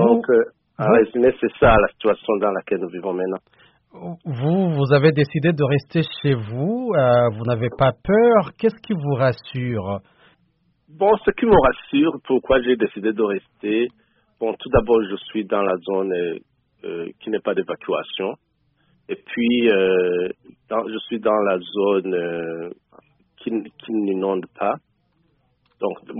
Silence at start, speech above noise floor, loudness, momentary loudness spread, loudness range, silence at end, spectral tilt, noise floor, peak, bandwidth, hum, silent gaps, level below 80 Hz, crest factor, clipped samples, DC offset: 0 s; 45 dB; -20 LUFS; 13 LU; 6 LU; 0 s; -5.5 dB/octave; -65 dBFS; -2 dBFS; 5.4 kHz; none; none; -42 dBFS; 20 dB; under 0.1%; under 0.1%